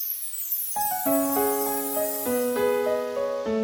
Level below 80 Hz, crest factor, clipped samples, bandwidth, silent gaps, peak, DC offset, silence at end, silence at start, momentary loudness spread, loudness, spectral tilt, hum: -62 dBFS; 14 dB; under 0.1%; over 20 kHz; none; -10 dBFS; under 0.1%; 0 s; 0 s; 4 LU; -25 LUFS; -3 dB/octave; none